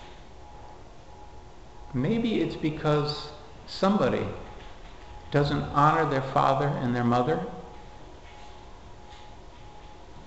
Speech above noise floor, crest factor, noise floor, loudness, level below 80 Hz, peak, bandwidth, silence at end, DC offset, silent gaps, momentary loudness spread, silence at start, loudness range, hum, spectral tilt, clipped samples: 22 dB; 20 dB; -47 dBFS; -26 LUFS; -48 dBFS; -8 dBFS; 8.2 kHz; 0 s; 0.4%; none; 25 LU; 0 s; 5 LU; none; -7 dB/octave; under 0.1%